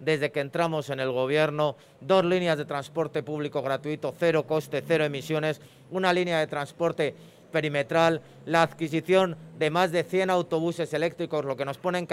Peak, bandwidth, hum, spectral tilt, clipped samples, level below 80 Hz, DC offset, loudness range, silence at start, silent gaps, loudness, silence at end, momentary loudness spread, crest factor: -8 dBFS; 16 kHz; none; -6 dB/octave; under 0.1%; -72 dBFS; under 0.1%; 2 LU; 0 s; none; -27 LUFS; 0 s; 7 LU; 18 dB